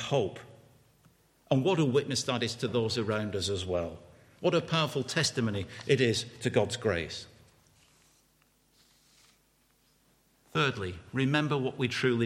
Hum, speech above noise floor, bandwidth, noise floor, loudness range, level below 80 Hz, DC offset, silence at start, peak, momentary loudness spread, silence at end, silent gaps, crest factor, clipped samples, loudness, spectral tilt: none; 39 dB; 15.5 kHz; -68 dBFS; 8 LU; -62 dBFS; under 0.1%; 0 s; -12 dBFS; 10 LU; 0 s; none; 20 dB; under 0.1%; -30 LUFS; -5 dB/octave